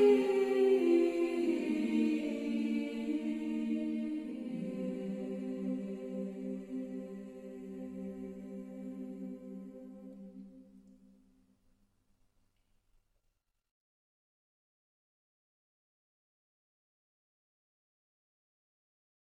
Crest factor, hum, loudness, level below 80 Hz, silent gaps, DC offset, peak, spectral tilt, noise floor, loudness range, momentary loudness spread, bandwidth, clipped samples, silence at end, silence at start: 20 dB; none; -35 LUFS; -74 dBFS; none; under 0.1%; -16 dBFS; -7 dB/octave; -80 dBFS; 18 LU; 19 LU; 13 kHz; under 0.1%; 8.5 s; 0 s